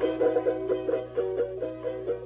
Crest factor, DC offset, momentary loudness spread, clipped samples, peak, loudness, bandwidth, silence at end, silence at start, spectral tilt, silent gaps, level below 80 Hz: 14 dB; under 0.1%; 8 LU; under 0.1%; -14 dBFS; -29 LUFS; 4 kHz; 0 s; 0 s; -10.5 dB/octave; none; -56 dBFS